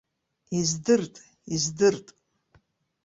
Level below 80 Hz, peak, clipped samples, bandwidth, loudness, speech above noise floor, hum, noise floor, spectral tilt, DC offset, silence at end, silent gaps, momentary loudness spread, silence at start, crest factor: -62 dBFS; -10 dBFS; under 0.1%; 8 kHz; -25 LUFS; 40 dB; none; -65 dBFS; -4 dB/octave; under 0.1%; 1.05 s; none; 12 LU; 0.5 s; 20 dB